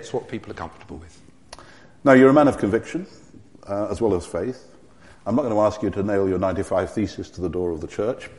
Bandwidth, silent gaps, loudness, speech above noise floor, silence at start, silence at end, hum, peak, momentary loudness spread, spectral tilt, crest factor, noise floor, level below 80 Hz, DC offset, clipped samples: 11.5 kHz; none; -21 LUFS; 29 dB; 0 s; 0.1 s; none; 0 dBFS; 20 LU; -7 dB/octave; 22 dB; -50 dBFS; -48 dBFS; 0.3%; under 0.1%